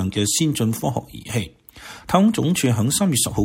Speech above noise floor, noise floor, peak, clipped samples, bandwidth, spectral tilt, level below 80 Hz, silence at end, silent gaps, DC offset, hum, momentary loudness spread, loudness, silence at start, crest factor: 21 dB; -41 dBFS; -4 dBFS; under 0.1%; 16.5 kHz; -4.5 dB/octave; -46 dBFS; 0 s; none; under 0.1%; none; 12 LU; -20 LUFS; 0 s; 16 dB